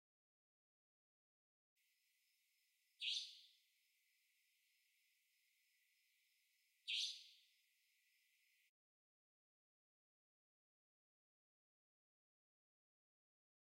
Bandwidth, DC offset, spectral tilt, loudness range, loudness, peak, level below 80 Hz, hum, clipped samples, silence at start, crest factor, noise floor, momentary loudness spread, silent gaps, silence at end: 16 kHz; under 0.1%; 7 dB/octave; 2 LU; -46 LUFS; -32 dBFS; under -90 dBFS; none; under 0.1%; 3 s; 28 dB; -84 dBFS; 18 LU; none; 6.4 s